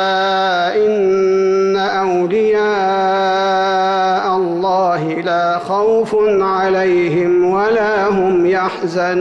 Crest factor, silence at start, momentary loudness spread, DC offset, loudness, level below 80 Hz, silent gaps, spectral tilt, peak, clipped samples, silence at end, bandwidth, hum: 8 dB; 0 s; 3 LU; under 0.1%; -14 LUFS; -52 dBFS; none; -6 dB/octave; -6 dBFS; under 0.1%; 0 s; 8 kHz; none